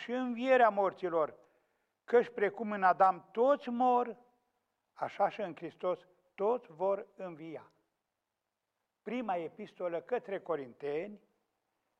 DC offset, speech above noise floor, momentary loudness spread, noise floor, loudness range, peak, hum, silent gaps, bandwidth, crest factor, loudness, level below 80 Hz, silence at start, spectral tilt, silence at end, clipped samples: under 0.1%; 55 dB; 17 LU; -88 dBFS; 10 LU; -16 dBFS; none; none; 7.6 kHz; 20 dB; -33 LUFS; -82 dBFS; 0 s; -6.5 dB/octave; 0.85 s; under 0.1%